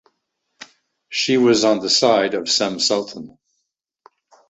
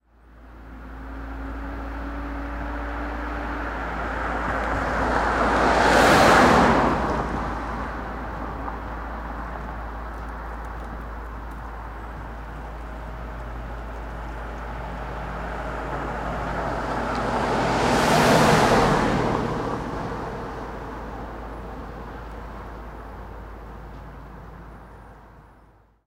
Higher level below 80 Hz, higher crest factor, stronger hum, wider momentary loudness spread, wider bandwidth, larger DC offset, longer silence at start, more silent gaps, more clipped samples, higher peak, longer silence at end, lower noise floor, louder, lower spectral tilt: second, -64 dBFS vs -36 dBFS; about the same, 20 dB vs 20 dB; neither; second, 11 LU vs 22 LU; second, 8.2 kHz vs 16 kHz; neither; first, 0.6 s vs 0.3 s; neither; neither; first, -2 dBFS vs -6 dBFS; first, 1.2 s vs 0.6 s; first, -76 dBFS vs -55 dBFS; first, -17 LUFS vs -24 LUFS; second, -3 dB/octave vs -5 dB/octave